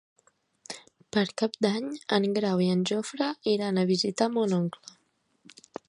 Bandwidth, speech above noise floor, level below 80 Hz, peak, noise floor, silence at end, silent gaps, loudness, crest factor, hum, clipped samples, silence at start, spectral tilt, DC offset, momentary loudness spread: 11 kHz; 42 dB; -74 dBFS; -10 dBFS; -69 dBFS; 1.2 s; none; -27 LUFS; 20 dB; none; under 0.1%; 0.7 s; -5.5 dB/octave; under 0.1%; 17 LU